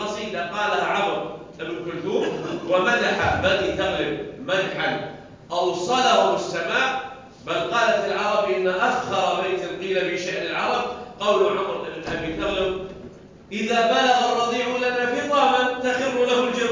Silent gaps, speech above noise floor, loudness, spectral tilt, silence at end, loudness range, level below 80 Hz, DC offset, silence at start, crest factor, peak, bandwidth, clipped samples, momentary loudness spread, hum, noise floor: none; 21 dB; -22 LUFS; -4 dB/octave; 0 s; 3 LU; -50 dBFS; under 0.1%; 0 s; 18 dB; -6 dBFS; 7.6 kHz; under 0.1%; 11 LU; none; -42 dBFS